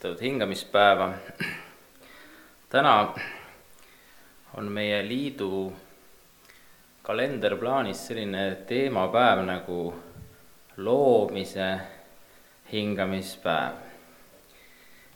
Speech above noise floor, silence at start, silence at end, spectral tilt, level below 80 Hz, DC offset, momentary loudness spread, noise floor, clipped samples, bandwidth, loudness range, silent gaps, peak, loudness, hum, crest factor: 30 dB; 0 s; 0.2 s; -5 dB/octave; -66 dBFS; under 0.1%; 17 LU; -55 dBFS; under 0.1%; 19 kHz; 7 LU; none; -4 dBFS; -26 LUFS; none; 24 dB